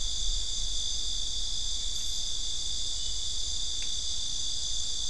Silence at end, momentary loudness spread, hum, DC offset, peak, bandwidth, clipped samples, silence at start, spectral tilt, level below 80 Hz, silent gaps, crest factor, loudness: 0 s; 1 LU; none; 3%; -16 dBFS; 12 kHz; under 0.1%; 0 s; 0 dB/octave; -40 dBFS; none; 14 dB; -31 LUFS